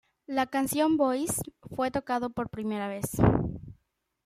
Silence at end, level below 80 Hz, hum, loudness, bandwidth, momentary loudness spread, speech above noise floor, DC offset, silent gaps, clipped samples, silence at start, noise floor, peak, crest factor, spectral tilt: 0.55 s; -48 dBFS; none; -29 LUFS; 16 kHz; 9 LU; 44 dB; under 0.1%; none; under 0.1%; 0.3 s; -72 dBFS; -8 dBFS; 20 dB; -5.5 dB/octave